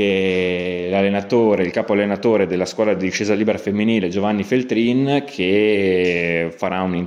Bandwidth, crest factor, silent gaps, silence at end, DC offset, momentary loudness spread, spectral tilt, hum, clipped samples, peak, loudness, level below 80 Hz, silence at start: 11 kHz; 16 dB; none; 0 s; under 0.1%; 4 LU; -6 dB/octave; none; under 0.1%; -2 dBFS; -18 LUFS; -60 dBFS; 0 s